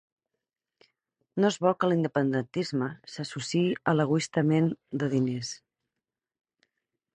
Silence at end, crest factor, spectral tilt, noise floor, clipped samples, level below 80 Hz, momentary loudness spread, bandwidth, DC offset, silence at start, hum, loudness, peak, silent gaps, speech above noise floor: 1.6 s; 20 dB; -6 dB/octave; -89 dBFS; under 0.1%; -70 dBFS; 11 LU; 10 kHz; under 0.1%; 1.35 s; none; -28 LUFS; -10 dBFS; none; 62 dB